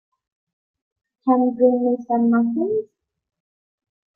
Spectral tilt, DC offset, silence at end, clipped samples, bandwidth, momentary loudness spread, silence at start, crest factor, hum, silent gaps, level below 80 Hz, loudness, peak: -11.5 dB/octave; under 0.1%; 1.3 s; under 0.1%; 2.2 kHz; 7 LU; 1.25 s; 18 dB; none; none; -72 dBFS; -20 LUFS; -6 dBFS